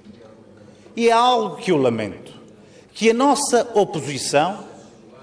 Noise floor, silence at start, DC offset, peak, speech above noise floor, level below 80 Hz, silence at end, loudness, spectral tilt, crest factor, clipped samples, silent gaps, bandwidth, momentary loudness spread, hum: -47 dBFS; 0.05 s; under 0.1%; -4 dBFS; 28 dB; -62 dBFS; 0.45 s; -19 LUFS; -4 dB/octave; 16 dB; under 0.1%; none; 11 kHz; 17 LU; none